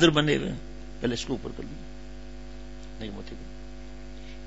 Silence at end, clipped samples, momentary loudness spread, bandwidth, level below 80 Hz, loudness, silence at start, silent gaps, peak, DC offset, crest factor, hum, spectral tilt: 0 s; under 0.1%; 18 LU; 8 kHz; -44 dBFS; -30 LUFS; 0 s; none; -4 dBFS; 0.8%; 26 dB; none; -5 dB/octave